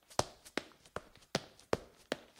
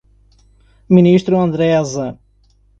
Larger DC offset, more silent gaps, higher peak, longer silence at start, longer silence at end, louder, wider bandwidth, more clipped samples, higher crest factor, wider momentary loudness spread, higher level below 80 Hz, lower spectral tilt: neither; neither; second, -10 dBFS vs 0 dBFS; second, 0.1 s vs 0.9 s; second, 0.2 s vs 0.65 s; second, -42 LUFS vs -14 LUFS; first, 17.5 kHz vs 7.6 kHz; neither; first, 34 dB vs 16 dB; about the same, 11 LU vs 13 LU; second, -64 dBFS vs -48 dBFS; second, -3.5 dB/octave vs -7.5 dB/octave